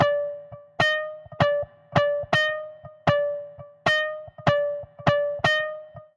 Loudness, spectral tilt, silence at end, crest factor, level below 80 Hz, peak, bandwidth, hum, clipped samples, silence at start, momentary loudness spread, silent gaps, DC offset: -24 LUFS; -5.5 dB/octave; 0.15 s; 20 dB; -58 dBFS; -6 dBFS; 11 kHz; none; under 0.1%; 0 s; 13 LU; none; under 0.1%